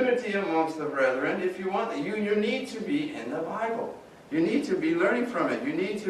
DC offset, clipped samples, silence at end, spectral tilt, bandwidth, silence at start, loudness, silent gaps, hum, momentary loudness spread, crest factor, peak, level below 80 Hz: under 0.1%; under 0.1%; 0 s; -6 dB/octave; 12.5 kHz; 0 s; -28 LUFS; none; none; 7 LU; 16 dB; -12 dBFS; -70 dBFS